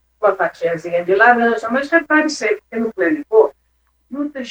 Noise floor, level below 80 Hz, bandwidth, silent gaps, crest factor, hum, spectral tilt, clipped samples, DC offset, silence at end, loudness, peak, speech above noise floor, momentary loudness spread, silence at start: -62 dBFS; -60 dBFS; 9.4 kHz; none; 16 dB; none; -4.5 dB/octave; under 0.1%; under 0.1%; 0 s; -16 LUFS; 0 dBFS; 46 dB; 12 LU; 0.2 s